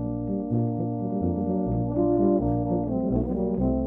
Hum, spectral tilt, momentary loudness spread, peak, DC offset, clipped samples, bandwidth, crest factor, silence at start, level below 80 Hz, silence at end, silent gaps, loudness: none; -14.5 dB/octave; 6 LU; -10 dBFS; under 0.1%; under 0.1%; 2.1 kHz; 14 dB; 0 s; -38 dBFS; 0 s; none; -26 LUFS